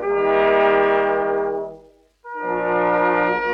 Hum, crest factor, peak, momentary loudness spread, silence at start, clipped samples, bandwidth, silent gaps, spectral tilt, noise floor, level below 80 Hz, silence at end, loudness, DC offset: none; 14 dB; -6 dBFS; 13 LU; 0 s; under 0.1%; 5.6 kHz; none; -7 dB/octave; -49 dBFS; -50 dBFS; 0 s; -19 LUFS; under 0.1%